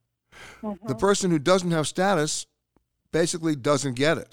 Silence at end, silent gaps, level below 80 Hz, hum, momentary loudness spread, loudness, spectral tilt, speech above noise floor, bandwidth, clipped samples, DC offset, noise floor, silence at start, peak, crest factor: 0.05 s; none; -56 dBFS; none; 12 LU; -24 LUFS; -4.5 dB/octave; 47 dB; 16.5 kHz; under 0.1%; under 0.1%; -71 dBFS; 0.35 s; -6 dBFS; 18 dB